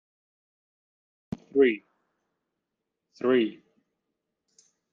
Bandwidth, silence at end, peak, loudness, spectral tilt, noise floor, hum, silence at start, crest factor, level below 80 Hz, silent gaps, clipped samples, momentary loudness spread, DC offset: 7 kHz; 1.4 s; -10 dBFS; -26 LUFS; -7 dB/octave; -84 dBFS; none; 1.55 s; 22 dB; -70 dBFS; none; under 0.1%; 17 LU; under 0.1%